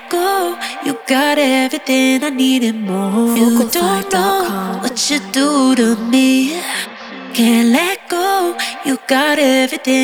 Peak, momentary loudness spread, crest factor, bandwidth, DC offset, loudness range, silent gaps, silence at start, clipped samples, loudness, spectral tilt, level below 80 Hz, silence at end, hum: 0 dBFS; 8 LU; 14 dB; 19.5 kHz; under 0.1%; 1 LU; none; 0 s; under 0.1%; -14 LUFS; -3.5 dB/octave; -58 dBFS; 0 s; none